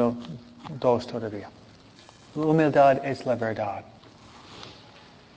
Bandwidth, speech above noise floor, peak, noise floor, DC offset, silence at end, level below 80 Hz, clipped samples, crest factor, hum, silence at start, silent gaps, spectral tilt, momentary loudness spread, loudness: 8 kHz; 28 dB; -8 dBFS; -51 dBFS; under 0.1%; 0.65 s; -62 dBFS; under 0.1%; 18 dB; none; 0 s; none; -7.5 dB/octave; 24 LU; -24 LUFS